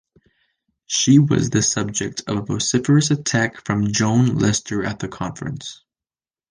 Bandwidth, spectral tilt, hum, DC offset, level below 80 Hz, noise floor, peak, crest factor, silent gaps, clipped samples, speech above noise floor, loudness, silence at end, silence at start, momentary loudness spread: 10 kHz; -4.5 dB/octave; none; under 0.1%; -48 dBFS; under -90 dBFS; -2 dBFS; 18 dB; none; under 0.1%; over 71 dB; -19 LUFS; 0.75 s; 0.9 s; 13 LU